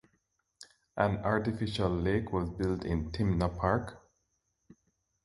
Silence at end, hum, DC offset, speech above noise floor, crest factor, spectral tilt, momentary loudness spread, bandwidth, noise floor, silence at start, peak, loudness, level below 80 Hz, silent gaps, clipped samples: 1.25 s; none; under 0.1%; 48 dB; 22 dB; -7.5 dB/octave; 5 LU; 11.5 kHz; -79 dBFS; 0.6 s; -12 dBFS; -32 LUFS; -46 dBFS; none; under 0.1%